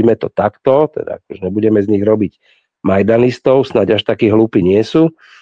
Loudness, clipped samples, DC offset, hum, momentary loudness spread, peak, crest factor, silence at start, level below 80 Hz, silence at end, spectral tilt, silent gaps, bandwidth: -13 LUFS; under 0.1%; under 0.1%; none; 9 LU; 0 dBFS; 12 dB; 0 s; -50 dBFS; 0.3 s; -8 dB/octave; none; 7.6 kHz